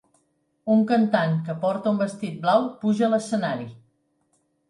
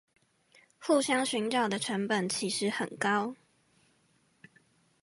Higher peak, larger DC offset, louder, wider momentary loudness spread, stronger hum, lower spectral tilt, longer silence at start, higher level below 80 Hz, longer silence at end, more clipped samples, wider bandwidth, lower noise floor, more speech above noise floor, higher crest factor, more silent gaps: first, -6 dBFS vs -16 dBFS; neither; first, -23 LUFS vs -30 LUFS; first, 9 LU vs 5 LU; neither; first, -7 dB/octave vs -3.5 dB/octave; second, 0.65 s vs 0.8 s; first, -72 dBFS vs -80 dBFS; second, 0.9 s vs 1.7 s; neither; about the same, 11 kHz vs 11.5 kHz; about the same, -69 dBFS vs -70 dBFS; first, 47 dB vs 40 dB; about the same, 18 dB vs 18 dB; neither